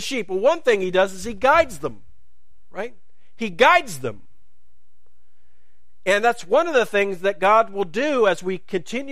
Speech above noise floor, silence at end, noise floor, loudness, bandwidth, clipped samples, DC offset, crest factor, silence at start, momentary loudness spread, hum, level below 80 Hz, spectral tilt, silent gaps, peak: 48 dB; 0 s; -68 dBFS; -20 LUFS; 15.5 kHz; under 0.1%; 2%; 20 dB; 0 s; 15 LU; none; -52 dBFS; -4 dB/octave; none; -2 dBFS